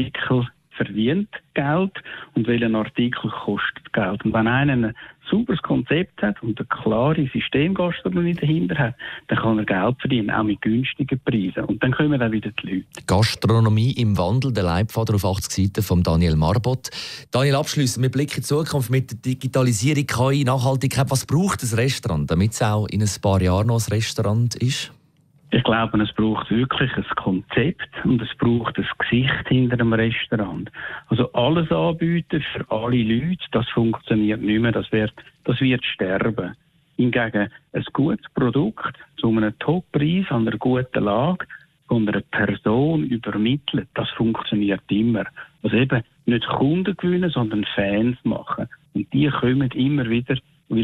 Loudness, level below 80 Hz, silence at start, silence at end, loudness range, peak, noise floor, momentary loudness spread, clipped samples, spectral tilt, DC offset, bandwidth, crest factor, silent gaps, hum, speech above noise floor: -21 LUFS; -46 dBFS; 0 s; 0 s; 2 LU; -8 dBFS; -56 dBFS; 7 LU; under 0.1%; -6 dB/octave; under 0.1%; 15 kHz; 14 dB; none; none; 36 dB